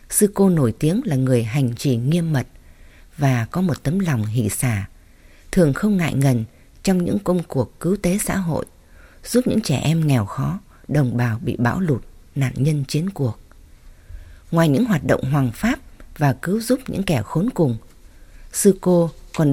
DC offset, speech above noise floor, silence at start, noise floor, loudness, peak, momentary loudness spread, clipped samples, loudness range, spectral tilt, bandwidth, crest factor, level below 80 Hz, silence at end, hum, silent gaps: under 0.1%; 28 dB; 0.1 s; -47 dBFS; -20 LUFS; -2 dBFS; 8 LU; under 0.1%; 2 LU; -6.5 dB/octave; 17 kHz; 18 dB; -42 dBFS; 0 s; none; none